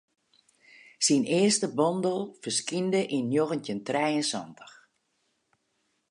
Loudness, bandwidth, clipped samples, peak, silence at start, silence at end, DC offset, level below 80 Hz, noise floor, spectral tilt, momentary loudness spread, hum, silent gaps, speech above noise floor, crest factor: -27 LUFS; 11 kHz; under 0.1%; -10 dBFS; 1 s; 1.4 s; under 0.1%; -78 dBFS; -75 dBFS; -4 dB/octave; 8 LU; none; none; 48 dB; 18 dB